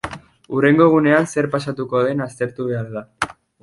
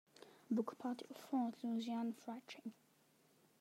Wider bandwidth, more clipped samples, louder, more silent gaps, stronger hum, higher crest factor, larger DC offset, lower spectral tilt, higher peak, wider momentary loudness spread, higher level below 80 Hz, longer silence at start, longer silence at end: second, 11.5 kHz vs 15.5 kHz; neither; first, -18 LUFS vs -44 LUFS; neither; neither; about the same, 16 dB vs 18 dB; neither; about the same, -6.5 dB/octave vs -6 dB/octave; first, -2 dBFS vs -28 dBFS; about the same, 14 LU vs 13 LU; first, -52 dBFS vs under -90 dBFS; second, 0.05 s vs 0.2 s; second, 0.3 s vs 0.9 s